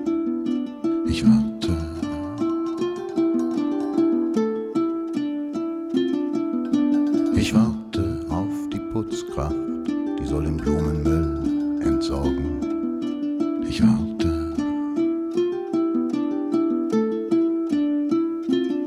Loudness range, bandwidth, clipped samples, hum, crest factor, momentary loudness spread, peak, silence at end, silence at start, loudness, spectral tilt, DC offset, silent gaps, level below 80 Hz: 2 LU; 12 kHz; under 0.1%; none; 16 dB; 6 LU; -6 dBFS; 0 s; 0 s; -23 LUFS; -7 dB/octave; under 0.1%; none; -38 dBFS